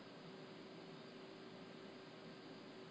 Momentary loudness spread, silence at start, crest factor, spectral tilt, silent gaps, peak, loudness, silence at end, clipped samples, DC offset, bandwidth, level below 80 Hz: 0 LU; 0 s; 12 dB; -5.5 dB/octave; none; -44 dBFS; -56 LUFS; 0 s; under 0.1%; under 0.1%; 8 kHz; -88 dBFS